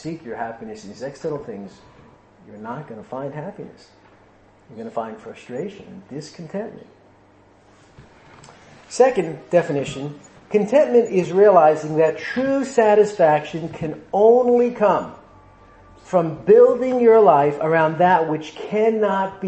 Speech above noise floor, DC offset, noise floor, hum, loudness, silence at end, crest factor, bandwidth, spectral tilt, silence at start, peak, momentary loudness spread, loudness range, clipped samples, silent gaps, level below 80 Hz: 34 dB; under 0.1%; -52 dBFS; none; -18 LUFS; 0 s; 18 dB; 8.8 kHz; -6.5 dB/octave; 0.05 s; -2 dBFS; 21 LU; 18 LU; under 0.1%; none; -60 dBFS